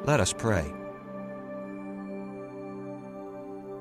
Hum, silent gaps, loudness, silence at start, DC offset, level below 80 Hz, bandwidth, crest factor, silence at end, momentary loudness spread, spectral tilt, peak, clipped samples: none; none; -34 LUFS; 0 s; under 0.1%; -52 dBFS; 15 kHz; 20 dB; 0 s; 15 LU; -5 dB/octave; -12 dBFS; under 0.1%